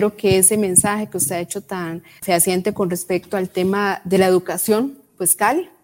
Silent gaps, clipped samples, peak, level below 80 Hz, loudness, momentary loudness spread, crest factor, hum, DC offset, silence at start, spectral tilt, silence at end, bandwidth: none; under 0.1%; 0 dBFS; -52 dBFS; -18 LUFS; 13 LU; 18 dB; none; under 0.1%; 0 s; -3.5 dB/octave; 0.15 s; 17 kHz